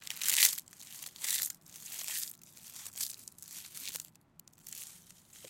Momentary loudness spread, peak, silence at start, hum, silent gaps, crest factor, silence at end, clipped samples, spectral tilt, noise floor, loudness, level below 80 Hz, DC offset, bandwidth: 23 LU; -6 dBFS; 0 s; none; none; 32 dB; 0 s; under 0.1%; 2.5 dB/octave; -62 dBFS; -33 LUFS; -80 dBFS; under 0.1%; 17 kHz